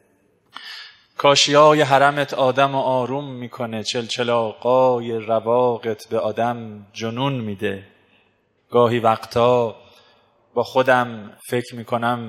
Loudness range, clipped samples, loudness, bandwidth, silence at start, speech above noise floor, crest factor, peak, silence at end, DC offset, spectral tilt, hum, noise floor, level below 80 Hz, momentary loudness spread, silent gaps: 6 LU; under 0.1%; -19 LUFS; 15.5 kHz; 0.55 s; 44 dB; 20 dB; 0 dBFS; 0 s; under 0.1%; -4.5 dB/octave; none; -63 dBFS; -64 dBFS; 16 LU; none